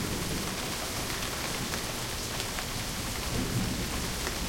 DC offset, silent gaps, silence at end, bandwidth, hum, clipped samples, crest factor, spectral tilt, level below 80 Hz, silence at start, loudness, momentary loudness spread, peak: under 0.1%; none; 0 s; 16.5 kHz; none; under 0.1%; 22 dB; -3 dB/octave; -42 dBFS; 0 s; -32 LUFS; 2 LU; -12 dBFS